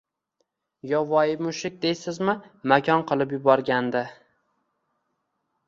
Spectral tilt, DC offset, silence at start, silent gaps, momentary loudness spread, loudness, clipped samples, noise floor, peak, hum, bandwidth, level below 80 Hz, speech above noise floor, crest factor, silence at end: -5.5 dB/octave; under 0.1%; 0.85 s; none; 9 LU; -24 LUFS; under 0.1%; -76 dBFS; -4 dBFS; none; 7.8 kHz; -68 dBFS; 53 dB; 22 dB; 1.55 s